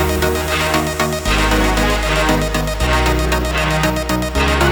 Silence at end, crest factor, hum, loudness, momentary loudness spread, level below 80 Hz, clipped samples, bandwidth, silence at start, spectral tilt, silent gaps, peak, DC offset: 0 s; 14 dB; none; -16 LUFS; 4 LU; -22 dBFS; under 0.1%; over 20 kHz; 0 s; -4.5 dB/octave; none; 0 dBFS; under 0.1%